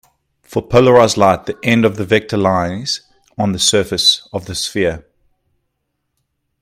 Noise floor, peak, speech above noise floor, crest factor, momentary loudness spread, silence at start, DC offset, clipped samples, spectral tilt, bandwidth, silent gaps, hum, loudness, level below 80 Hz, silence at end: -72 dBFS; 0 dBFS; 58 dB; 16 dB; 12 LU; 0.5 s; under 0.1%; under 0.1%; -4 dB/octave; 16 kHz; none; none; -14 LUFS; -46 dBFS; 1.6 s